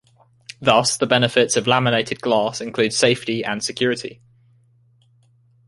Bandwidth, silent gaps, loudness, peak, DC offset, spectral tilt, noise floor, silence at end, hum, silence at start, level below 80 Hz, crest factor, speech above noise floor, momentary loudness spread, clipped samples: 11.5 kHz; none; -19 LUFS; 0 dBFS; under 0.1%; -3.5 dB/octave; -57 dBFS; 1.55 s; none; 0.6 s; -58 dBFS; 20 dB; 38 dB; 8 LU; under 0.1%